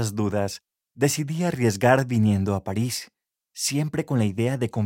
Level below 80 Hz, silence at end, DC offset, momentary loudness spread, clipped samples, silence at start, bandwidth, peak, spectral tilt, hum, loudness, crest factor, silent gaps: -62 dBFS; 0 s; under 0.1%; 8 LU; under 0.1%; 0 s; 17 kHz; -4 dBFS; -5.5 dB/octave; none; -24 LUFS; 20 dB; none